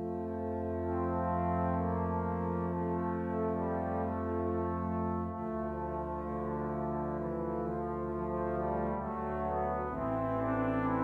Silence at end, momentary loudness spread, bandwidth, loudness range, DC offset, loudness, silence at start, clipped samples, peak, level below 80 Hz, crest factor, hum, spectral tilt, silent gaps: 0 s; 5 LU; 4.2 kHz; 2 LU; under 0.1%; -35 LUFS; 0 s; under 0.1%; -20 dBFS; -50 dBFS; 14 dB; none; -10.5 dB/octave; none